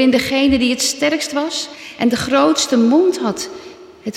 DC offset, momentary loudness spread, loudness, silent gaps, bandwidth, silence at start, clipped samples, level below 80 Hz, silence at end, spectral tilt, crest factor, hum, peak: under 0.1%; 13 LU; -16 LUFS; none; 16 kHz; 0 s; under 0.1%; -46 dBFS; 0 s; -3 dB/octave; 14 dB; none; -4 dBFS